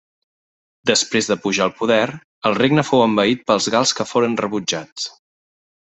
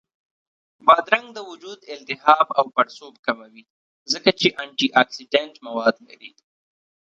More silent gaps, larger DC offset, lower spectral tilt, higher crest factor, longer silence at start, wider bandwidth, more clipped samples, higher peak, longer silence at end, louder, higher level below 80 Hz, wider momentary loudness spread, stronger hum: second, 2.24-2.42 s, 4.92-4.96 s vs 3.19-3.23 s, 3.70-4.06 s; neither; about the same, -3.5 dB/octave vs -3.5 dB/octave; about the same, 18 dB vs 22 dB; about the same, 0.85 s vs 0.85 s; about the same, 8.4 kHz vs 9 kHz; neither; about the same, -2 dBFS vs 0 dBFS; about the same, 0.8 s vs 0.8 s; about the same, -18 LUFS vs -20 LUFS; first, -60 dBFS vs -68 dBFS; second, 9 LU vs 19 LU; neither